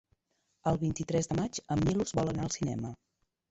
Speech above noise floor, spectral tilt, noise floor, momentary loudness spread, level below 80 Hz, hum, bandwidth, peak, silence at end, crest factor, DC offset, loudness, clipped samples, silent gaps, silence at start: 47 dB; -6 dB/octave; -78 dBFS; 6 LU; -52 dBFS; none; 8.2 kHz; -16 dBFS; 0.55 s; 18 dB; under 0.1%; -32 LUFS; under 0.1%; none; 0.65 s